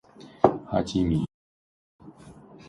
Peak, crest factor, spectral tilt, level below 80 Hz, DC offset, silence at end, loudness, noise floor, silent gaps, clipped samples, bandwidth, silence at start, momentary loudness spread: -2 dBFS; 26 dB; -7.5 dB/octave; -46 dBFS; under 0.1%; 0.35 s; -26 LUFS; -49 dBFS; 1.34-1.99 s; under 0.1%; 11.5 kHz; 0.2 s; 5 LU